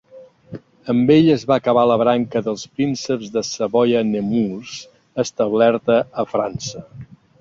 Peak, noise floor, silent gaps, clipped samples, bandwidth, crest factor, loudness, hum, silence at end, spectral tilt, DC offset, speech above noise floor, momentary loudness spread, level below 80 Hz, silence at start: -2 dBFS; -44 dBFS; none; under 0.1%; 7.8 kHz; 16 dB; -18 LUFS; none; 0.35 s; -6 dB/octave; under 0.1%; 26 dB; 17 LU; -56 dBFS; 0.15 s